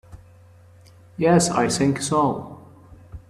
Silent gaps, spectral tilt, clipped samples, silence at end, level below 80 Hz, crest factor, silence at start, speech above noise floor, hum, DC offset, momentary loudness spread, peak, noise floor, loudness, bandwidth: none; -5 dB/octave; under 0.1%; 0.1 s; -52 dBFS; 20 dB; 0.1 s; 30 dB; none; under 0.1%; 18 LU; -4 dBFS; -49 dBFS; -20 LUFS; 13.5 kHz